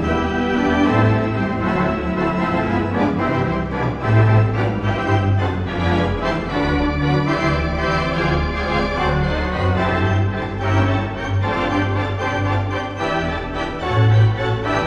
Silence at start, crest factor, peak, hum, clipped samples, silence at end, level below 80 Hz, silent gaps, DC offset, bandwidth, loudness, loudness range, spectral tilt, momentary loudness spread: 0 s; 14 dB; -4 dBFS; none; under 0.1%; 0 s; -32 dBFS; none; under 0.1%; 7.4 kHz; -19 LUFS; 2 LU; -7.5 dB/octave; 6 LU